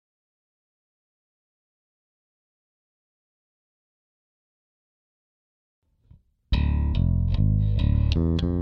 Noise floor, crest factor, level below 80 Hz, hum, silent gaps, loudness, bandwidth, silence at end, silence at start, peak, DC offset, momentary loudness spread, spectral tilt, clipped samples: -57 dBFS; 20 dB; -32 dBFS; none; none; -24 LUFS; 6.2 kHz; 0 s; 6.5 s; -8 dBFS; under 0.1%; 2 LU; -9 dB/octave; under 0.1%